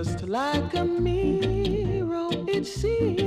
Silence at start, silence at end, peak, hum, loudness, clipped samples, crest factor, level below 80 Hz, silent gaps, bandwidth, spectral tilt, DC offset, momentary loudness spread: 0 s; 0 s; -12 dBFS; none; -26 LUFS; under 0.1%; 14 dB; -38 dBFS; none; 14.5 kHz; -6.5 dB/octave; under 0.1%; 3 LU